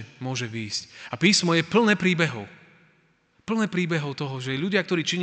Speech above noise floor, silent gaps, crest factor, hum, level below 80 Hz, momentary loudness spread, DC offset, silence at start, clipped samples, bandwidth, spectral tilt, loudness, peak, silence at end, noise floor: 39 dB; none; 20 dB; none; -68 dBFS; 12 LU; under 0.1%; 0 s; under 0.1%; 9.4 kHz; -4.5 dB/octave; -24 LUFS; -6 dBFS; 0 s; -64 dBFS